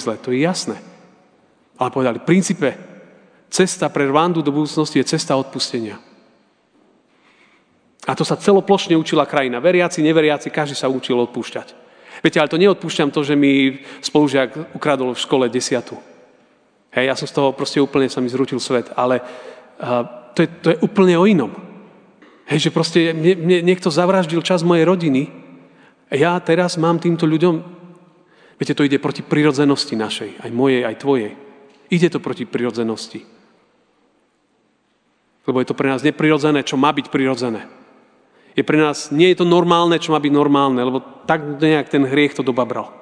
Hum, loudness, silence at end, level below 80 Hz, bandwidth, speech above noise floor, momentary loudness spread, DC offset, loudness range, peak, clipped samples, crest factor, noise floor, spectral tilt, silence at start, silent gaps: none; -17 LUFS; 0.1 s; -68 dBFS; 10 kHz; 46 dB; 10 LU; under 0.1%; 6 LU; 0 dBFS; under 0.1%; 18 dB; -63 dBFS; -5.5 dB/octave; 0 s; none